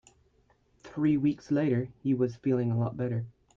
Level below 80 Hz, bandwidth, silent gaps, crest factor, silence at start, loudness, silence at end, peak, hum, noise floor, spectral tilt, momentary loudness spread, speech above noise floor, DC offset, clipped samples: -64 dBFS; 7.6 kHz; none; 14 dB; 0.85 s; -29 LUFS; 0.25 s; -16 dBFS; none; -67 dBFS; -9.5 dB/octave; 7 LU; 39 dB; under 0.1%; under 0.1%